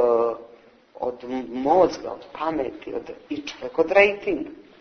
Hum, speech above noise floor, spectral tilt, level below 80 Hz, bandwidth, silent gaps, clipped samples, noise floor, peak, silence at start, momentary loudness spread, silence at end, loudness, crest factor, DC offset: none; 28 dB; -5 dB/octave; -56 dBFS; 6.6 kHz; none; under 0.1%; -51 dBFS; -2 dBFS; 0 s; 16 LU; 0.2 s; -24 LUFS; 22 dB; under 0.1%